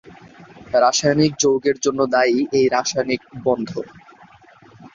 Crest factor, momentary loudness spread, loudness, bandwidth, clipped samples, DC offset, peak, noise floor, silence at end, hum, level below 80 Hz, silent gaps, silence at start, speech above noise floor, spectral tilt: 16 dB; 8 LU; -18 LUFS; 7.6 kHz; under 0.1%; under 0.1%; -4 dBFS; -48 dBFS; 0.05 s; none; -56 dBFS; none; 0.05 s; 30 dB; -4 dB/octave